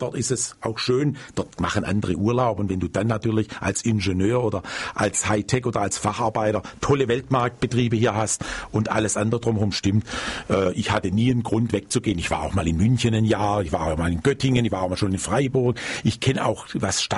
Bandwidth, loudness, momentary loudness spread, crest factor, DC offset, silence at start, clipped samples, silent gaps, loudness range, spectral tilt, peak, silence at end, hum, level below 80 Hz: 11.5 kHz; -23 LUFS; 5 LU; 14 dB; under 0.1%; 0 s; under 0.1%; none; 1 LU; -5 dB/octave; -8 dBFS; 0 s; none; -42 dBFS